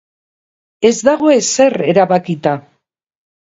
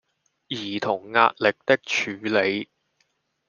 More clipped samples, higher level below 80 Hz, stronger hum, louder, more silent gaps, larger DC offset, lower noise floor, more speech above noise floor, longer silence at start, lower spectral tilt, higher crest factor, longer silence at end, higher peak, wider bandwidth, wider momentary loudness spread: neither; first, -58 dBFS vs -72 dBFS; neither; first, -13 LUFS vs -23 LUFS; neither; neither; second, -64 dBFS vs -71 dBFS; first, 52 dB vs 48 dB; first, 0.8 s vs 0.5 s; about the same, -4.5 dB/octave vs -4 dB/octave; second, 14 dB vs 22 dB; about the same, 0.9 s vs 0.85 s; about the same, 0 dBFS vs -2 dBFS; first, 8 kHz vs 7.2 kHz; second, 7 LU vs 12 LU